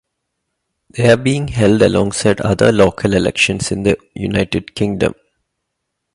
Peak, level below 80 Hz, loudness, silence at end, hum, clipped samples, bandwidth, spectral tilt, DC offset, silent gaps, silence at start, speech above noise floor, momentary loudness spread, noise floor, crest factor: 0 dBFS; -38 dBFS; -15 LUFS; 1.05 s; none; under 0.1%; 11.5 kHz; -5.5 dB/octave; under 0.1%; none; 0.95 s; 60 dB; 8 LU; -75 dBFS; 16 dB